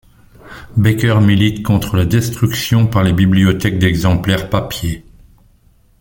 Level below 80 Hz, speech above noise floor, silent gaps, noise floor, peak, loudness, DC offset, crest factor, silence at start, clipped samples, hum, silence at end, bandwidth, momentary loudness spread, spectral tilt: -36 dBFS; 38 dB; none; -51 dBFS; 0 dBFS; -14 LUFS; under 0.1%; 14 dB; 0.45 s; under 0.1%; none; 1 s; 17 kHz; 8 LU; -6 dB/octave